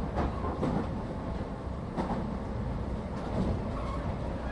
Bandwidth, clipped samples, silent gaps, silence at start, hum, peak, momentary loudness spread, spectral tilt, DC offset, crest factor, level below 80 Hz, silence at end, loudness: 11 kHz; under 0.1%; none; 0 s; none; -18 dBFS; 5 LU; -8.5 dB/octave; under 0.1%; 14 dB; -38 dBFS; 0 s; -34 LUFS